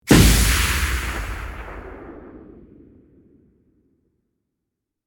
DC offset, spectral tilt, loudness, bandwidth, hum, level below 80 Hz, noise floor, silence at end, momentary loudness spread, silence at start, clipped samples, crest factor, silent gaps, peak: under 0.1%; -4 dB/octave; -18 LUFS; over 20 kHz; none; -26 dBFS; -81 dBFS; 2.7 s; 26 LU; 0.05 s; under 0.1%; 20 dB; none; -2 dBFS